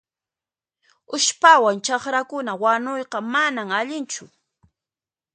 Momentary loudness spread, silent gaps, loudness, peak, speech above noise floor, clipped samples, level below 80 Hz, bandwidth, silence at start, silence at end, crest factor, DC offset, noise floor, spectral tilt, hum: 15 LU; none; -20 LUFS; 0 dBFS; over 70 dB; under 0.1%; -74 dBFS; 9.4 kHz; 1.1 s; 1.1 s; 22 dB; under 0.1%; under -90 dBFS; -1.5 dB/octave; none